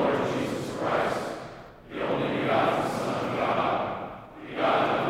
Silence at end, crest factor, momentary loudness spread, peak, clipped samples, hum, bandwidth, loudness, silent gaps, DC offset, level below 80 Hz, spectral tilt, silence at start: 0 s; 16 dB; 15 LU; -12 dBFS; under 0.1%; none; 16 kHz; -27 LUFS; none; under 0.1%; -58 dBFS; -5.5 dB/octave; 0 s